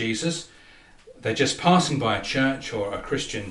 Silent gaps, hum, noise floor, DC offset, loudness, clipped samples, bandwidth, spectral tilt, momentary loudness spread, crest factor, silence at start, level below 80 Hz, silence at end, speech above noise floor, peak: none; none; -51 dBFS; under 0.1%; -24 LUFS; under 0.1%; 11.5 kHz; -4.5 dB/octave; 11 LU; 20 dB; 0 s; -50 dBFS; 0 s; 27 dB; -6 dBFS